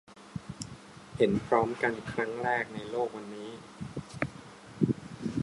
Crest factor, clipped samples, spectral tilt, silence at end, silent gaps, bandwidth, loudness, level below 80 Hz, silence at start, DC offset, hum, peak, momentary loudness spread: 22 dB; under 0.1%; -6.5 dB/octave; 0 s; none; 11.5 kHz; -32 LUFS; -58 dBFS; 0.1 s; under 0.1%; none; -10 dBFS; 16 LU